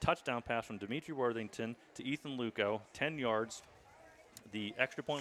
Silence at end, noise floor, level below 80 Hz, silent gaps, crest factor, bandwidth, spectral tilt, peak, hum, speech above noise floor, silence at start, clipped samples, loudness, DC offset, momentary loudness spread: 0 s; -61 dBFS; -64 dBFS; none; 24 dB; 15 kHz; -5 dB/octave; -16 dBFS; none; 22 dB; 0 s; under 0.1%; -39 LUFS; under 0.1%; 9 LU